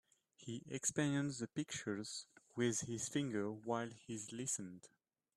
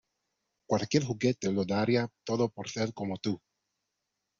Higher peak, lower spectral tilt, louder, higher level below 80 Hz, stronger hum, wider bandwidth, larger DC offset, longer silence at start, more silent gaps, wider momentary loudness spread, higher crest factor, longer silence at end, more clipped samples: second, -24 dBFS vs -10 dBFS; second, -4 dB/octave vs -5.5 dB/octave; second, -42 LUFS vs -31 LUFS; second, -78 dBFS vs -68 dBFS; neither; first, 13.5 kHz vs 7.6 kHz; neither; second, 0.4 s vs 0.7 s; neither; first, 12 LU vs 7 LU; about the same, 20 dB vs 22 dB; second, 0.5 s vs 1.05 s; neither